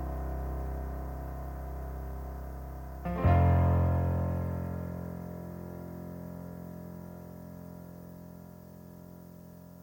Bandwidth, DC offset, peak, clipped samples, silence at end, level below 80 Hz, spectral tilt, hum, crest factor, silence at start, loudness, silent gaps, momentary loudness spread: 17 kHz; under 0.1%; -14 dBFS; under 0.1%; 0 s; -42 dBFS; -9.5 dB/octave; none; 20 dB; 0 s; -33 LUFS; none; 23 LU